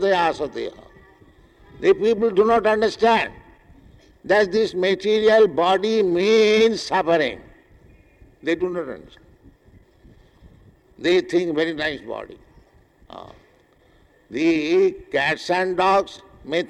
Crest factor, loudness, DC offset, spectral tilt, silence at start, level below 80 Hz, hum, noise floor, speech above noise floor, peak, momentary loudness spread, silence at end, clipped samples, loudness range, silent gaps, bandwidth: 14 dB; -20 LUFS; under 0.1%; -5 dB/octave; 0 s; -54 dBFS; none; -56 dBFS; 37 dB; -6 dBFS; 17 LU; 0.05 s; under 0.1%; 10 LU; none; 10.5 kHz